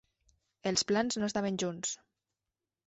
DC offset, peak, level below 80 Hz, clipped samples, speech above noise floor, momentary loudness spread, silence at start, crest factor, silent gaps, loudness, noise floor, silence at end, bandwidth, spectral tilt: under 0.1%; -14 dBFS; -70 dBFS; under 0.1%; over 58 dB; 9 LU; 0.65 s; 20 dB; none; -33 LUFS; under -90 dBFS; 0.9 s; 8.2 kHz; -3.5 dB/octave